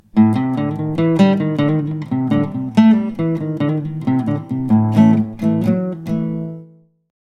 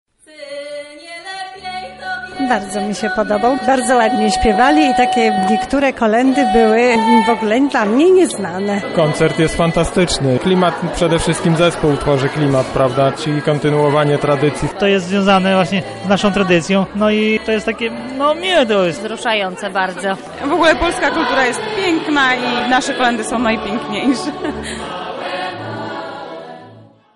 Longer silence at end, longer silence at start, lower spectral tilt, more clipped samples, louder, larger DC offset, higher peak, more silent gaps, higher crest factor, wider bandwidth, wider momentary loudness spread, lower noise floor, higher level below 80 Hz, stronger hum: first, 0.55 s vs 0.35 s; second, 0.15 s vs 0.35 s; first, -9 dB/octave vs -5 dB/octave; neither; about the same, -17 LUFS vs -15 LUFS; neither; about the same, 0 dBFS vs 0 dBFS; neither; about the same, 16 dB vs 14 dB; second, 7 kHz vs 11.5 kHz; second, 9 LU vs 13 LU; about the same, -44 dBFS vs -42 dBFS; second, -52 dBFS vs -38 dBFS; neither